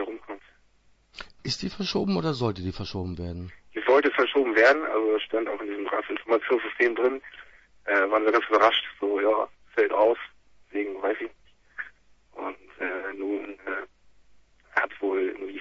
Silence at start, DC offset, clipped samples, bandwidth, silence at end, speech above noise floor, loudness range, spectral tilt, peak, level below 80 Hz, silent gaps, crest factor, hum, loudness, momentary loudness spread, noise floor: 0 s; under 0.1%; under 0.1%; 8 kHz; 0 s; 36 dB; 10 LU; -5.5 dB/octave; -6 dBFS; -58 dBFS; none; 20 dB; none; -26 LUFS; 18 LU; -61 dBFS